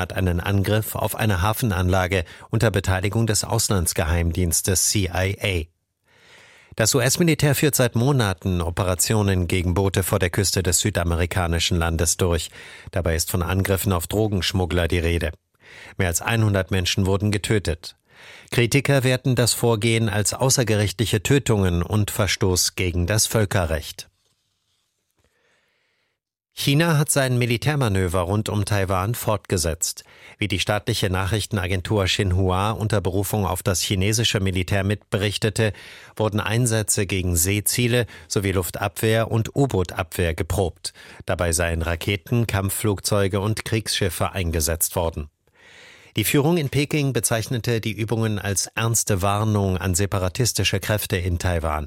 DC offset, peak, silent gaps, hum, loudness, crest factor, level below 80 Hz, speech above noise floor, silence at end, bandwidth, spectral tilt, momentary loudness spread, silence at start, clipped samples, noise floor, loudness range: under 0.1%; -4 dBFS; none; none; -21 LUFS; 18 dB; -38 dBFS; 55 dB; 0 s; 16.5 kHz; -4.5 dB/octave; 6 LU; 0 s; under 0.1%; -77 dBFS; 3 LU